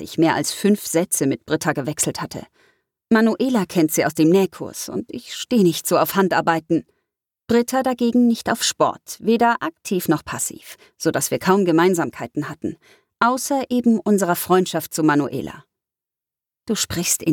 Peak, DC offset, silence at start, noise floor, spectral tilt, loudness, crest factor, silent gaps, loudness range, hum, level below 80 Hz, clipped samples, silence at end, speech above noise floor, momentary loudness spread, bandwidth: -2 dBFS; under 0.1%; 0 s; -89 dBFS; -4.5 dB/octave; -20 LUFS; 18 dB; none; 2 LU; none; -58 dBFS; under 0.1%; 0 s; 69 dB; 11 LU; 19 kHz